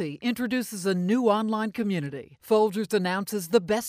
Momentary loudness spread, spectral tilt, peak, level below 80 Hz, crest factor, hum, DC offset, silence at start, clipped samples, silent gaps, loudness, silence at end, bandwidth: 6 LU; -5.5 dB/octave; -8 dBFS; -66 dBFS; 18 dB; none; under 0.1%; 0 s; under 0.1%; none; -26 LUFS; 0 s; 15.5 kHz